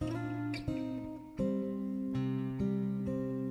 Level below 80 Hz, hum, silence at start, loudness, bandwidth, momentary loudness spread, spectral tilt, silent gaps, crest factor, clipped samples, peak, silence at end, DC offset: -56 dBFS; none; 0 s; -36 LUFS; 11.5 kHz; 4 LU; -8.5 dB/octave; none; 12 dB; under 0.1%; -22 dBFS; 0 s; under 0.1%